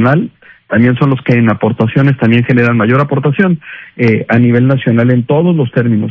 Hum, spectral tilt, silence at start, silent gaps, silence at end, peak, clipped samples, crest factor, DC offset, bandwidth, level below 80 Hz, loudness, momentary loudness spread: none; -10 dB/octave; 0 s; none; 0 s; 0 dBFS; 0.6%; 10 dB; under 0.1%; 5.8 kHz; -46 dBFS; -11 LUFS; 4 LU